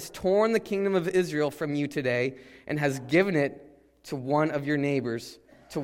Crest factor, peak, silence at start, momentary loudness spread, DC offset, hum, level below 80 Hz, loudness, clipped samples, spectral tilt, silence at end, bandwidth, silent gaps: 18 dB; -10 dBFS; 0 s; 12 LU; under 0.1%; none; -62 dBFS; -27 LUFS; under 0.1%; -6 dB/octave; 0 s; 16 kHz; none